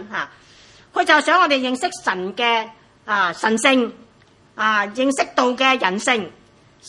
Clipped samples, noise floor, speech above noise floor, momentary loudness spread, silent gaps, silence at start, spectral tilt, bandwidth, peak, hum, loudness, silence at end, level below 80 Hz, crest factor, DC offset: under 0.1%; -53 dBFS; 34 dB; 12 LU; none; 0 s; -2.5 dB/octave; 11.5 kHz; 0 dBFS; none; -18 LUFS; 0 s; -66 dBFS; 20 dB; under 0.1%